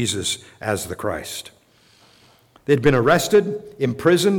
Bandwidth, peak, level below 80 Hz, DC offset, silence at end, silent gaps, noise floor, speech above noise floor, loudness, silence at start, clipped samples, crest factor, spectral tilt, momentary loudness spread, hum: 18 kHz; -6 dBFS; -48 dBFS; under 0.1%; 0 s; none; -55 dBFS; 36 dB; -20 LUFS; 0 s; under 0.1%; 16 dB; -4.5 dB/octave; 13 LU; none